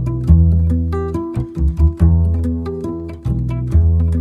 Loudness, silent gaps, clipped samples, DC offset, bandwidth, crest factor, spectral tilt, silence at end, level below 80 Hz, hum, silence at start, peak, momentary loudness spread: -17 LUFS; none; under 0.1%; under 0.1%; 2.8 kHz; 14 dB; -10.5 dB/octave; 0 s; -18 dBFS; none; 0 s; 0 dBFS; 10 LU